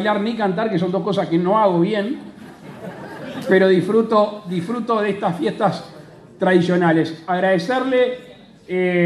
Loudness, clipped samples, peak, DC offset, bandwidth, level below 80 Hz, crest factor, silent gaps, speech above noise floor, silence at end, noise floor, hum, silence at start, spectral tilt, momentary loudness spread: -19 LUFS; under 0.1%; -2 dBFS; under 0.1%; 12 kHz; -64 dBFS; 16 dB; none; 20 dB; 0 s; -38 dBFS; none; 0 s; -7.5 dB/octave; 17 LU